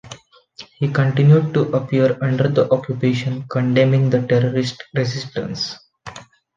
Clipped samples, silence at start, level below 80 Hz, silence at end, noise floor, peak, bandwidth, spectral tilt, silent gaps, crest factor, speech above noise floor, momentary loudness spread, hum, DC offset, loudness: under 0.1%; 0.05 s; -56 dBFS; 0.35 s; -43 dBFS; -2 dBFS; 7.4 kHz; -7.5 dB/octave; none; 16 dB; 26 dB; 12 LU; none; under 0.1%; -18 LUFS